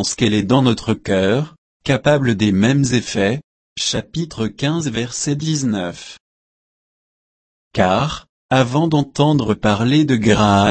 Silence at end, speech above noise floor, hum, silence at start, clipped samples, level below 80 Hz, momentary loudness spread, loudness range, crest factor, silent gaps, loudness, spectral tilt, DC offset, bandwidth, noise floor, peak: 0 s; over 74 dB; none; 0 s; under 0.1%; -44 dBFS; 11 LU; 6 LU; 16 dB; 1.58-1.80 s, 3.44-3.76 s, 6.20-7.71 s, 8.29-8.49 s; -17 LUFS; -5.5 dB/octave; under 0.1%; 8.8 kHz; under -90 dBFS; 0 dBFS